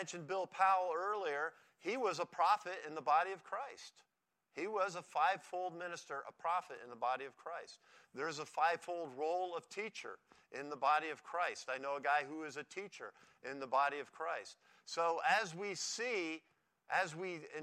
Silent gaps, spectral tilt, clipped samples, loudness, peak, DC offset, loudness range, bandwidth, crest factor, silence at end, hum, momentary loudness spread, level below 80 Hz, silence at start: none; -2.5 dB/octave; under 0.1%; -39 LUFS; -18 dBFS; under 0.1%; 4 LU; 13.5 kHz; 20 dB; 0 s; none; 15 LU; under -90 dBFS; 0 s